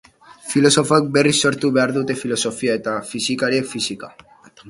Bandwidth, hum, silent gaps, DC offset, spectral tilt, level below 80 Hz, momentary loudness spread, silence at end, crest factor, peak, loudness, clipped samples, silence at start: 11.5 kHz; none; none; under 0.1%; -4 dB/octave; -58 dBFS; 10 LU; 0 s; 18 dB; 0 dBFS; -18 LUFS; under 0.1%; 0.3 s